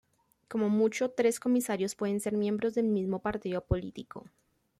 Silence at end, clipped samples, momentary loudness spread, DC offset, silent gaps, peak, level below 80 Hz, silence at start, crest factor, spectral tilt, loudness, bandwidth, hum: 0.6 s; under 0.1%; 11 LU; under 0.1%; none; -14 dBFS; -52 dBFS; 0.5 s; 18 dB; -6 dB/octave; -30 LUFS; 15 kHz; none